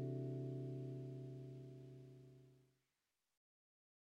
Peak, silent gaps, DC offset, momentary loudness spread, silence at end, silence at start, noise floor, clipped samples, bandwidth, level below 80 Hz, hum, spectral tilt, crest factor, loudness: -36 dBFS; none; under 0.1%; 17 LU; 1.5 s; 0 s; under -90 dBFS; under 0.1%; 6.2 kHz; -82 dBFS; none; -10 dB/octave; 16 dB; -50 LUFS